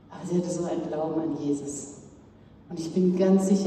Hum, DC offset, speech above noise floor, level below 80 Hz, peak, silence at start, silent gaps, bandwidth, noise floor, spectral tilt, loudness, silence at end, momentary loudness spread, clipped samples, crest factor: none; under 0.1%; 26 dB; -62 dBFS; -10 dBFS; 0.1 s; none; 12 kHz; -52 dBFS; -7 dB/octave; -27 LUFS; 0 s; 16 LU; under 0.1%; 16 dB